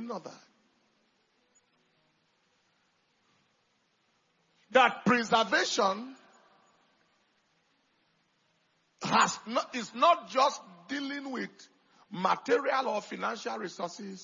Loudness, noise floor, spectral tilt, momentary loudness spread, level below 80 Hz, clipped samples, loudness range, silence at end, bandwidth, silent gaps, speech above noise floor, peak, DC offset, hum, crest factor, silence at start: -29 LUFS; -73 dBFS; -1.5 dB/octave; 15 LU; -82 dBFS; under 0.1%; 6 LU; 0 s; 7.4 kHz; none; 44 dB; -10 dBFS; under 0.1%; none; 24 dB; 0 s